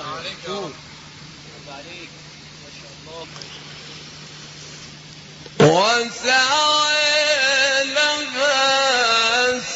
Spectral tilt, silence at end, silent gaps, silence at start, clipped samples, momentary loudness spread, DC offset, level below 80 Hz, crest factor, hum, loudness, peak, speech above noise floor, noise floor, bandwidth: -2 dB/octave; 0 s; none; 0 s; under 0.1%; 23 LU; under 0.1%; -56 dBFS; 20 dB; none; -17 LUFS; 0 dBFS; 19 dB; -40 dBFS; 8.2 kHz